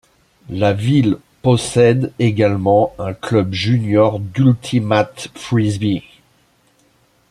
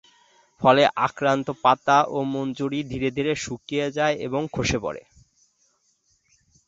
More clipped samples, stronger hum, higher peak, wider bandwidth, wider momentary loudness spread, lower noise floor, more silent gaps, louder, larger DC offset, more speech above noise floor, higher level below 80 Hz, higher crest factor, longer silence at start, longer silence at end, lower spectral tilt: neither; neither; first, 0 dBFS vs -4 dBFS; first, 12 kHz vs 8 kHz; second, 7 LU vs 10 LU; second, -57 dBFS vs -67 dBFS; neither; first, -16 LUFS vs -23 LUFS; neither; second, 41 dB vs 45 dB; about the same, -50 dBFS vs -50 dBFS; about the same, 16 dB vs 20 dB; about the same, 0.5 s vs 0.6 s; second, 1.3 s vs 1.65 s; first, -7 dB/octave vs -5 dB/octave